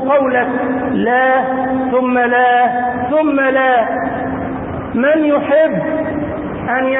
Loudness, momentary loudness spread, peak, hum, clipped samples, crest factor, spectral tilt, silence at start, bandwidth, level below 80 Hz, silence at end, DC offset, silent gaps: -14 LUFS; 9 LU; -2 dBFS; none; under 0.1%; 12 dB; -11.5 dB/octave; 0 s; 3.9 kHz; -42 dBFS; 0 s; under 0.1%; none